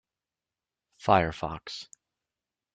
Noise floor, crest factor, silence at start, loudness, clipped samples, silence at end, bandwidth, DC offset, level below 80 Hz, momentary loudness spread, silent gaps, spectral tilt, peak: under -90 dBFS; 26 dB; 1 s; -28 LUFS; under 0.1%; 0.9 s; 9.2 kHz; under 0.1%; -56 dBFS; 17 LU; none; -5.5 dB/octave; -6 dBFS